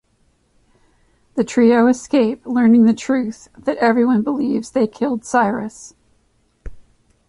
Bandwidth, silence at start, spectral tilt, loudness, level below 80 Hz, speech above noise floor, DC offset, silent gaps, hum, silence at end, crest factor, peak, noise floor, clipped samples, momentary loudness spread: 11 kHz; 1.35 s; -6 dB/octave; -17 LUFS; -50 dBFS; 45 dB; under 0.1%; none; none; 0.5 s; 16 dB; -2 dBFS; -61 dBFS; under 0.1%; 12 LU